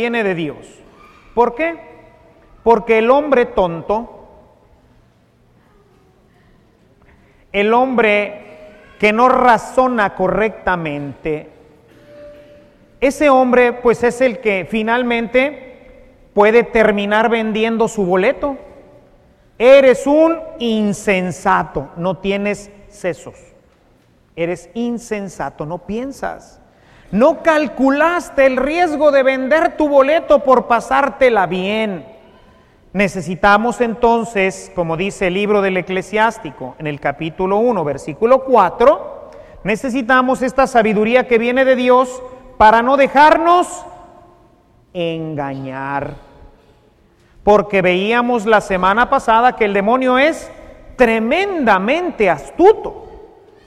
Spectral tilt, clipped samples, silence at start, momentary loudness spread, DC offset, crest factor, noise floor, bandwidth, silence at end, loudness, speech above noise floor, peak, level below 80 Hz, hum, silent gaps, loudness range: -5.5 dB/octave; under 0.1%; 0 s; 13 LU; under 0.1%; 16 dB; -53 dBFS; 13 kHz; 0.4 s; -15 LUFS; 38 dB; 0 dBFS; -44 dBFS; none; none; 8 LU